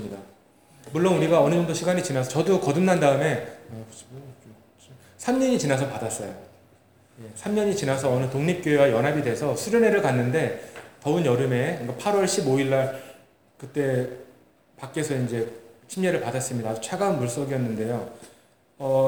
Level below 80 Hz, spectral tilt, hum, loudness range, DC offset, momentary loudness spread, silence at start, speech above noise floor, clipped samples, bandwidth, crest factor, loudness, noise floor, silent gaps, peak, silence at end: -66 dBFS; -5.5 dB/octave; none; 6 LU; 0.1%; 19 LU; 0 s; 33 dB; under 0.1%; over 20 kHz; 20 dB; -24 LUFS; -57 dBFS; none; -6 dBFS; 0 s